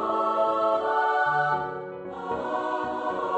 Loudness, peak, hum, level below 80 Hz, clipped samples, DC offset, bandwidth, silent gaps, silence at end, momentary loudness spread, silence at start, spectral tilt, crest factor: -26 LUFS; -12 dBFS; none; -62 dBFS; under 0.1%; under 0.1%; 8.6 kHz; none; 0 s; 11 LU; 0 s; -6 dB/octave; 14 dB